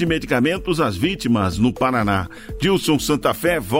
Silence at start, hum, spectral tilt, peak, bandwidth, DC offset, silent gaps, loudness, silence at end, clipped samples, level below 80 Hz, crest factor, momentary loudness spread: 0 s; none; -5.5 dB/octave; -4 dBFS; 16.5 kHz; under 0.1%; none; -19 LUFS; 0 s; under 0.1%; -38 dBFS; 14 dB; 3 LU